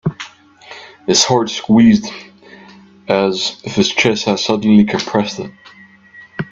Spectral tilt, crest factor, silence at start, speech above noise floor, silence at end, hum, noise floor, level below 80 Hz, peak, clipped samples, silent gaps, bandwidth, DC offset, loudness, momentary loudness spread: -4 dB/octave; 16 dB; 0.05 s; 28 dB; 0.1 s; none; -42 dBFS; -52 dBFS; 0 dBFS; under 0.1%; none; 7.8 kHz; under 0.1%; -14 LUFS; 22 LU